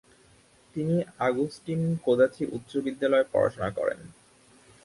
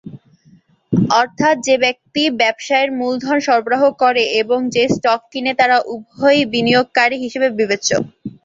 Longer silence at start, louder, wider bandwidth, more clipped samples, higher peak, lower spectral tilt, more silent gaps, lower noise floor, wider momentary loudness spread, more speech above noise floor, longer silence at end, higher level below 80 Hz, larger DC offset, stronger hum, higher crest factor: first, 0.75 s vs 0.05 s; second, -27 LUFS vs -15 LUFS; first, 11.5 kHz vs 7.8 kHz; neither; second, -10 dBFS vs -2 dBFS; first, -7.5 dB/octave vs -4 dB/octave; neither; first, -59 dBFS vs -51 dBFS; first, 9 LU vs 5 LU; about the same, 32 dB vs 35 dB; first, 0.75 s vs 0.15 s; about the same, -60 dBFS vs -56 dBFS; neither; neither; about the same, 18 dB vs 16 dB